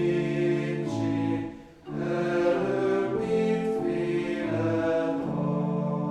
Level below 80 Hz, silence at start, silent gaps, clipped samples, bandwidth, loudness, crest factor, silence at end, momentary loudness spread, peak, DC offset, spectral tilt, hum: -58 dBFS; 0 s; none; under 0.1%; 10 kHz; -27 LUFS; 14 dB; 0 s; 5 LU; -12 dBFS; under 0.1%; -8 dB/octave; none